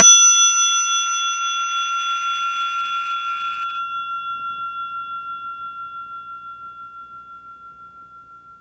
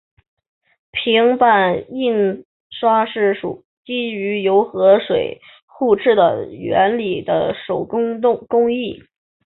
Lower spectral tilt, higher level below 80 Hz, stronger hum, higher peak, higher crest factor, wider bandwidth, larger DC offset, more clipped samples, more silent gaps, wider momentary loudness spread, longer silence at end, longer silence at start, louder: second, 3 dB/octave vs -10 dB/octave; second, -68 dBFS vs -58 dBFS; neither; about the same, 0 dBFS vs -2 dBFS; about the same, 20 dB vs 16 dB; first, 10.5 kHz vs 4.2 kHz; neither; neither; second, none vs 2.45-2.70 s, 3.65-3.83 s, 5.62-5.68 s; first, 23 LU vs 13 LU; second, 0.05 s vs 0.5 s; second, 0 s vs 0.95 s; about the same, -18 LUFS vs -17 LUFS